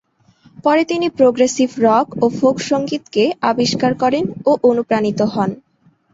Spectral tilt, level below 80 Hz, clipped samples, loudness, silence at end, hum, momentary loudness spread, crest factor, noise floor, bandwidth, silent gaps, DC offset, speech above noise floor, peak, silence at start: -5 dB/octave; -56 dBFS; under 0.1%; -16 LUFS; 0.6 s; none; 5 LU; 14 dB; -52 dBFS; 8 kHz; none; under 0.1%; 36 dB; -2 dBFS; 0.6 s